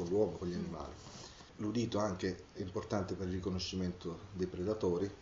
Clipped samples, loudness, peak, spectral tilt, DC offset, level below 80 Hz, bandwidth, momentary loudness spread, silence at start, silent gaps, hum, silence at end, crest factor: under 0.1%; -39 LUFS; -20 dBFS; -6 dB/octave; under 0.1%; -60 dBFS; 7.6 kHz; 12 LU; 0 s; none; none; 0 s; 18 dB